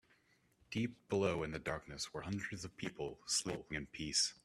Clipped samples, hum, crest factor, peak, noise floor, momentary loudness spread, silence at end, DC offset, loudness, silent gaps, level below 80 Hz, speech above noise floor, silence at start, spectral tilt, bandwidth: under 0.1%; none; 20 dB; -20 dBFS; -73 dBFS; 9 LU; 0.1 s; under 0.1%; -40 LUFS; none; -64 dBFS; 33 dB; 0.7 s; -3 dB/octave; 14.5 kHz